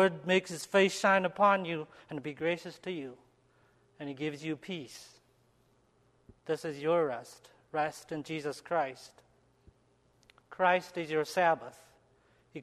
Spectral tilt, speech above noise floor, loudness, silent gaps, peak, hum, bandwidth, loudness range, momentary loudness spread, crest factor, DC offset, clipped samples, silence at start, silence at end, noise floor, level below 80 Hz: -4.5 dB/octave; 37 dB; -32 LUFS; none; -12 dBFS; none; 13 kHz; 11 LU; 19 LU; 22 dB; under 0.1%; under 0.1%; 0 s; 0 s; -69 dBFS; -74 dBFS